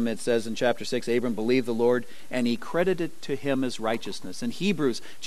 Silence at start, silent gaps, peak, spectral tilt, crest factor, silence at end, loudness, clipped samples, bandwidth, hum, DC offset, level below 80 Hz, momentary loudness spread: 0 s; none; -8 dBFS; -5 dB/octave; 18 dB; 0 s; -27 LUFS; under 0.1%; 13 kHz; none; 2%; -62 dBFS; 7 LU